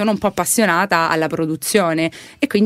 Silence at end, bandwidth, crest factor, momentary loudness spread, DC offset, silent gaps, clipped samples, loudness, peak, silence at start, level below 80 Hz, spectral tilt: 0 s; 16 kHz; 16 dB; 6 LU; under 0.1%; none; under 0.1%; -17 LUFS; 0 dBFS; 0 s; -54 dBFS; -4 dB/octave